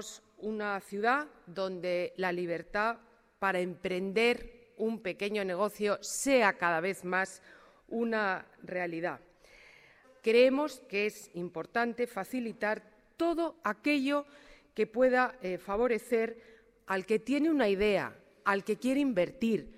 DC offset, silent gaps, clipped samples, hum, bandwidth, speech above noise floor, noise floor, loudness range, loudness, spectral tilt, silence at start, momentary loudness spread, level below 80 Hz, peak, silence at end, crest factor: under 0.1%; none; under 0.1%; none; 16 kHz; 29 dB; -60 dBFS; 3 LU; -32 LUFS; -4.5 dB/octave; 0 s; 12 LU; -62 dBFS; -12 dBFS; 0.05 s; 20 dB